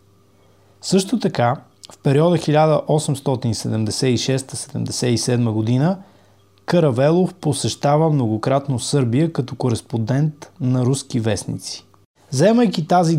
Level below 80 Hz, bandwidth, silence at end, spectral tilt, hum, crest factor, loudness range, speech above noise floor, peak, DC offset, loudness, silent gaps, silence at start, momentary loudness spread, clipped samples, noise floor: -56 dBFS; 15.5 kHz; 0 s; -6 dB/octave; none; 16 dB; 2 LU; 36 dB; -2 dBFS; under 0.1%; -19 LUFS; 12.06-12.14 s; 0.85 s; 9 LU; under 0.1%; -54 dBFS